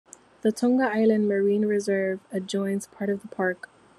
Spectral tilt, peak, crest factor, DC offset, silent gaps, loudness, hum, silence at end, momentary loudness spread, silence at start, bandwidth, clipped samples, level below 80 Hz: -6 dB/octave; -10 dBFS; 16 dB; under 0.1%; none; -25 LUFS; none; 0.45 s; 8 LU; 0.45 s; 12.5 kHz; under 0.1%; -72 dBFS